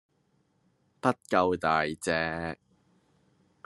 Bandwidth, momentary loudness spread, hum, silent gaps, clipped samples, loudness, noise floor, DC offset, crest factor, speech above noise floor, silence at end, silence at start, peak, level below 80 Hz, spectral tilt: 12.5 kHz; 11 LU; none; none; under 0.1%; -29 LUFS; -71 dBFS; under 0.1%; 24 dB; 43 dB; 1.1 s; 1.05 s; -8 dBFS; -64 dBFS; -5 dB/octave